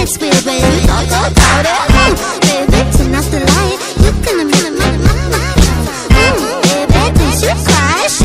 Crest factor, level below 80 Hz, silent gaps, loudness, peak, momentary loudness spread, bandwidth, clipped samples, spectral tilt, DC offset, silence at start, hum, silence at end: 10 dB; -16 dBFS; none; -11 LUFS; 0 dBFS; 4 LU; 16 kHz; 0.5%; -4.5 dB/octave; under 0.1%; 0 s; none; 0 s